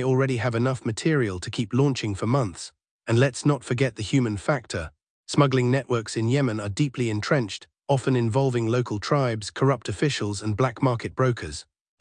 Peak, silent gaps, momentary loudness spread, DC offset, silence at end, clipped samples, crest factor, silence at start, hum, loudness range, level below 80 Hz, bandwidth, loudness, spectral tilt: -6 dBFS; 2.91-2.99 s, 5.10-5.24 s; 8 LU; under 0.1%; 0.4 s; under 0.1%; 20 dB; 0 s; none; 1 LU; -56 dBFS; 10 kHz; -25 LUFS; -6 dB/octave